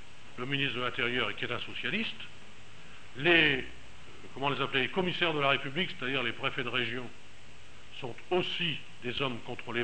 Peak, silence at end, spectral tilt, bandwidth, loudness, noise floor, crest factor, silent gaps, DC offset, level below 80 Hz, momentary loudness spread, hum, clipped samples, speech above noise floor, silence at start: -8 dBFS; 0 s; -5 dB/octave; 8.8 kHz; -30 LUFS; -54 dBFS; 26 dB; none; 1%; -62 dBFS; 21 LU; none; under 0.1%; 22 dB; 0 s